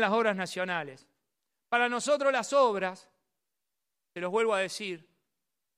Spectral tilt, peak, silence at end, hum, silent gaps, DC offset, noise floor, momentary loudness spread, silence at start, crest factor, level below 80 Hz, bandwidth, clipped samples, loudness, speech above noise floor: -3.5 dB/octave; -12 dBFS; 0.8 s; none; none; under 0.1%; -87 dBFS; 13 LU; 0 s; 20 dB; -88 dBFS; 14 kHz; under 0.1%; -29 LUFS; 59 dB